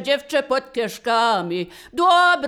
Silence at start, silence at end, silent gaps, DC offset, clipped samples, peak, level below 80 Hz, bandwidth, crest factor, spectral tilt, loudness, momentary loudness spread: 0 s; 0 s; none; under 0.1%; under 0.1%; -4 dBFS; -60 dBFS; 16 kHz; 14 dB; -3.5 dB/octave; -20 LUFS; 12 LU